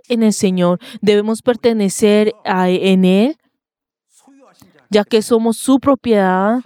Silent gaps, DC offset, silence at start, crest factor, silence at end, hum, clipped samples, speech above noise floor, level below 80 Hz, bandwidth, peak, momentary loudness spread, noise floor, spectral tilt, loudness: none; under 0.1%; 0.1 s; 14 dB; 0.05 s; none; under 0.1%; 72 dB; -58 dBFS; 16 kHz; 0 dBFS; 5 LU; -85 dBFS; -5.5 dB/octave; -14 LUFS